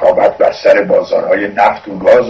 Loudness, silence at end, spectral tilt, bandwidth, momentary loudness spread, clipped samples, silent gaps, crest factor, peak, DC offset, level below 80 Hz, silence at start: -11 LUFS; 0 s; -6 dB/octave; 7.4 kHz; 4 LU; 0.8%; none; 10 dB; 0 dBFS; under 0.1%; -48 dBFS; 0 s